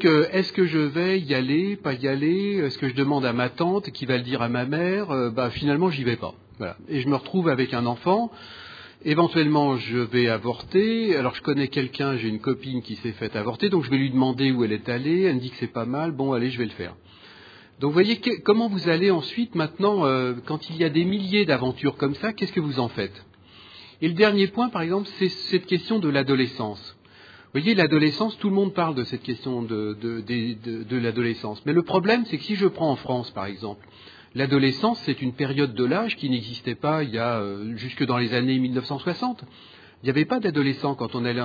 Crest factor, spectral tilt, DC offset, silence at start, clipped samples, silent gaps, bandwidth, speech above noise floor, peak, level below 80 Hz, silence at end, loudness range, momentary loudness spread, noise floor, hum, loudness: 20 dB; -8 dB/octave; under 0.1%; 0 s; under 0.1%; none; 5 kHz; 26 dB; -4 dBFS; -62 dBFS; 0 s; 3 LU; 10 LU; -49 dBFS; none; -24 LUFS